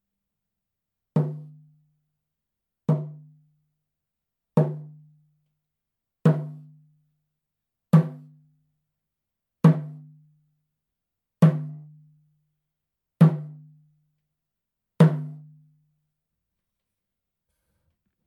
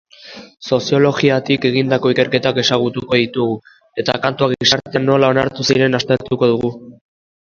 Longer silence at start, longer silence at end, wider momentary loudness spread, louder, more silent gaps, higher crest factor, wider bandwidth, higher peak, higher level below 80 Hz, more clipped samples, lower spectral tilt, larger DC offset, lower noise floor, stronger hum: first, 1.15 s vs 0.25 s; first, 2.9 s vs 0.65 s; first, 20 LU vs 10 LU; second, -23 LUFS vs -16 LUFS; neither; first, 24 dB vs 16 dB; second, 5 kHz vs 7.4 kHz; second, -4 dBFS vs 0 dBFS; second, -74 dBFS vs -52 dBFS; neither; first, -10 dB/octave vs -5 dB/octave; neither; first, -85 dBFS vs -38 dBFS; neither